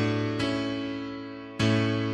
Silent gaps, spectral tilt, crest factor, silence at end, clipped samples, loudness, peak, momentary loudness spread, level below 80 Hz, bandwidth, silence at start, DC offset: none; -6.5 dB/octave; 16 dB; 0 s; under 0.1%; -28 LUFS; -12 dBFS; 12 LU; -54 dBFS; 10 kHz; 0 s; under 0.1%